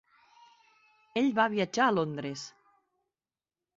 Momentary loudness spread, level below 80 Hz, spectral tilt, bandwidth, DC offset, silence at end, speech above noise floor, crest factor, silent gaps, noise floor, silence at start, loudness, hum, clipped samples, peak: 14 LU; -74 dBFS; -5 dB/octave; 7.8 kHz; under 0.1%; 1.3 s; over 62 dB; 20 dB; none; under -90 dBFS; 1.15 s; -29 LUFS; none; under 0.1%; -12 dBFS